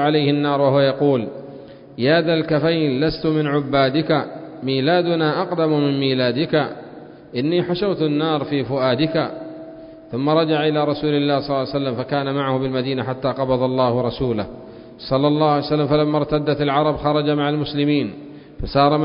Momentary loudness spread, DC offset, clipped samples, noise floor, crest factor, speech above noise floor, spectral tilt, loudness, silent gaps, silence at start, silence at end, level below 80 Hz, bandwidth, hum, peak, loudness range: 14 LU; under 0.1%; under 0.1%; -39 dBFS; 18 dB; 20 dB; -11.5 dB/octave; -19 LUFS; none; 0 s; 0 s; -46 dBFS; 5.4 kHz; none; -2 dBFS; 2 LU